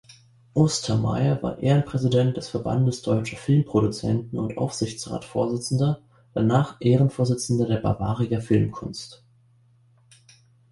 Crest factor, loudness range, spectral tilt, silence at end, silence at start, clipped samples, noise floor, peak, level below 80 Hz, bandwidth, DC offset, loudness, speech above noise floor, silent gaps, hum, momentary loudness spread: 18 dB; 2 LU; -6.5 dB/octave; 1.55 s; 0.1 s; under 0.1%; -58 dBFS; -6 dBFS; -50 dBFS; 11.5 kHz; under 0.1%; -24 LUFS; 36 dB; none; none; 8 LU